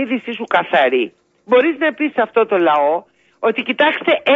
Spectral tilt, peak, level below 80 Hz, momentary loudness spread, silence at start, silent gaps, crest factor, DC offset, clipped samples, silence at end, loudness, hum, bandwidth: -6 dB/octave; 0 dBFS; -74 dBFS; 7 LU; 0 s; none; 16 dB; under 0.1%; under 0.1%; 0 s; -16 LUFS; none; 7.2 kHz